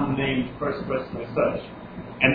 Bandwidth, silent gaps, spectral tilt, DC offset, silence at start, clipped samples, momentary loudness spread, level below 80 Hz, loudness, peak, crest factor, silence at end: 5 kHz; none; -9.5 dB/octave; under 0.1%; 0 s; under 0.1%; 15 LU; -48 dBFS; -26 LUFS; -2 dBFS; 24 dB; 0 s